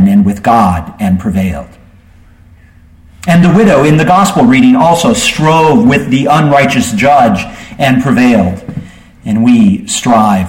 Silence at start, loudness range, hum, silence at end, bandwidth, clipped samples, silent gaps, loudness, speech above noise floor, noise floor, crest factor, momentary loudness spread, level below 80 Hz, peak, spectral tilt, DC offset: 0 s; 5 LU; none; 0 s; 16.5 kHz; under 0.1%; none; -8 LUFS; 32 dB; -39 dBFS; 8 dB; 10 LU; -34 dBFS; 0 dBFS; -5.5 dB/octave; under 0.1%